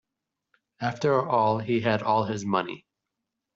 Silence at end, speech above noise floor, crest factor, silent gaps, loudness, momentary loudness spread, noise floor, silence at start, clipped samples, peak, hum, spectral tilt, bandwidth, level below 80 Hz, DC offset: 0.8 s; 60 dB; 18 dB; none; -26 LUFS; 9 LU; -85 dBFS; 0.8 s; under 0.1%; -8 dBFS; none; -5 dB/octave; 8 kHz; -68 dBFS; under 0.1%